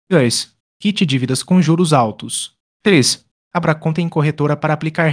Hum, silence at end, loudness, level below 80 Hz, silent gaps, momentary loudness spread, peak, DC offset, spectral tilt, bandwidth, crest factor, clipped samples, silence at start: none; 0 s; -16 LUFS; -58 dBFS; 0.60-0.80 s, 2.60-2.80 s, 3.31-3.51 s; 10 LU; 0 dBFS; under 0.1%; -5 dB/octave; 10.5 kHz; 16 dB; under 0.1%; 0.1 s